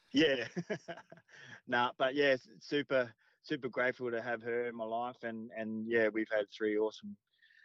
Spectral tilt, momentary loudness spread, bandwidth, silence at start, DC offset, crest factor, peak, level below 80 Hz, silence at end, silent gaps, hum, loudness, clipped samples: -5.5 dB/octave; 14 LU; 7.6 kHz; 0.15 s; under 0.1%; 16 dB; -20 dBFS; -78 dBFS; 0.5 s; none; none; -35 LUFS; under 0.1%